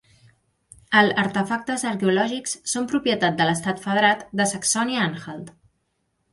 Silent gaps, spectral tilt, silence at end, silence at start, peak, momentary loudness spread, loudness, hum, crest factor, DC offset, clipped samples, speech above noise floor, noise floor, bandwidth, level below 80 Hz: none; -3.5 dB/octave; 0.8 s; 0.9 s; -4 dBFS; 7 LU; -22 LUFS; none; 20 dB; under 0.1%; under 0.1%; 50 dB; -72 dBFS; 12 kHz; -62 dBFS